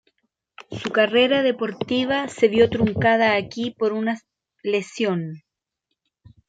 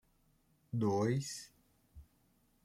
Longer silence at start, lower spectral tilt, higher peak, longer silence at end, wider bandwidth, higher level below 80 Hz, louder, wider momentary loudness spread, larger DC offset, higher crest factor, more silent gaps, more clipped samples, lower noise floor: about the same, 0.7 s vs 0.75 s; about the same, -5.5 dB/octave vs -6 dB/octave; first, -4 dBFS vs -22 dBFS; first, 1.1 s vs 0.6 s; second, 9.2 kHz vs 15.5 kHz; first, -56 dBFS vs -68 dBFS; first, -21 LUFS vs -37 LUFS; second, 12 LU vs 15 LU; neither; about the same, 18 dB vs 18 dB; neither; neither; first, -79 dBFS vs -73 dBFS